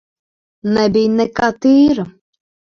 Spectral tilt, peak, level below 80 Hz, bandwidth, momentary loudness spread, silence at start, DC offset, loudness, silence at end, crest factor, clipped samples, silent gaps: -6.5 dB/octave; 0 dBFS; -48 dBFS; 6.8 kHz; 11 LU; 0.65 s; under 0.1%; -14 LUFS; 0.6 s; 16 dB; under 0.1%; none